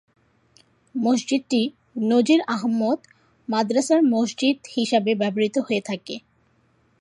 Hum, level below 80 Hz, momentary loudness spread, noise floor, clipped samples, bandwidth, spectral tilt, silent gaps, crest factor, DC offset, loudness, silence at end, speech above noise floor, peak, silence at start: none; -72 dBFS; 11 LU; -63 dBFS; under 0.1%; 11.5 kHz; -4.5 dB/octave; none; 18 dB; under 0.1%; -22 LUFS; 0.85 s; 42 dB; -6 dBFS; 0.95 s